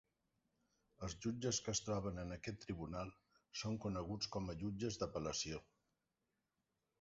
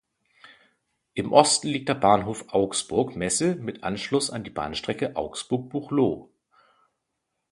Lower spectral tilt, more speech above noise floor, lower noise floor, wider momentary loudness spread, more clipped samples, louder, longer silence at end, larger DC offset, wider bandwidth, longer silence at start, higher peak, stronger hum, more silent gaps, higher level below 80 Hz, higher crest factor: about the same, -5 dB/octave vs -4 dB/octave; second, 45 dB vs 55 dB; first, -89 dBFS vs -80 dBFS; about the same, 9 LU vs 11 LU; neither; second, -45 LUFS vs -25 LUFS; first, 1.4 s vs 1.25 s; neither; second, 7.6 kHz vs 11.5 kHz; second, 1 s vs 1.15 s; second, -26 dBFS vs 0 dBFS; neither; neither; second, -62 dBFS vs -56 dBFS; second, 20 dB vs 26 dB